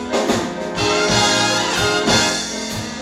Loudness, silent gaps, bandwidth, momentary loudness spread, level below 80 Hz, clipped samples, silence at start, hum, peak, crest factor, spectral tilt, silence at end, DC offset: -17 LUFS; none; 16.5 kHz; 9 LU; -42 dBFS; under 0.1%; 0 s; none; -4 dBFS; 14 dB; -2.5 dB/octave; 0 s; under 0.1%